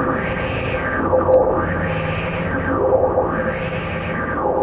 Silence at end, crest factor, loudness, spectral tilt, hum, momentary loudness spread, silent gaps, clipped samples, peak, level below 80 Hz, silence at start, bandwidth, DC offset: 0 s; 16 dB; -19 LUFS; -11 dB/octave; none; 7 LU; none; under 0.1%; -4 dBFS; -34 dBFS; 0 s; 4 kHz; under 0.1%